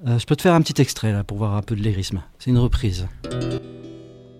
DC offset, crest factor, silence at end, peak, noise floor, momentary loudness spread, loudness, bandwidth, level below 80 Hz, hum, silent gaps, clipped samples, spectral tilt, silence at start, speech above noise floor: under 0.1%; 18 dB; 0.15 s; -4 dBFS; -41 dBFS; 15 LU; -22 LUFS; 15 kHz; -34 dBFS; none; none; under 0.1%; -6 dB/octave; 0 s; 21 dB